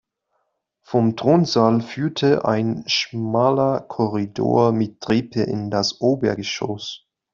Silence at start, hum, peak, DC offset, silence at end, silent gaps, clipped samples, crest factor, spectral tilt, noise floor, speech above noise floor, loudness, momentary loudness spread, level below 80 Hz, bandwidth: 0.9 s; none; -2 dBFS; under 0.1%; 0.35 s; none; under 0.1%; 18 dB; -6 dB/octave; -72 dBFS; 52 dB; -20 LUFS; 8 LU; -58 dBFS; 7.4 kHz